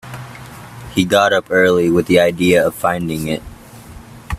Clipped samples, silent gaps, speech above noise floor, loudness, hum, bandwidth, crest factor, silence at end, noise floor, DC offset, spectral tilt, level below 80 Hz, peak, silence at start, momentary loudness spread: under 0.1%; none; 23 dB; -15 LUFS; none; 16 kHz; 16 dB; 0 s; -37 dBFS; under 0.1%; -5 dB/octave; -44 dBFS; 0 dBFS; 0.05 s; 20 LU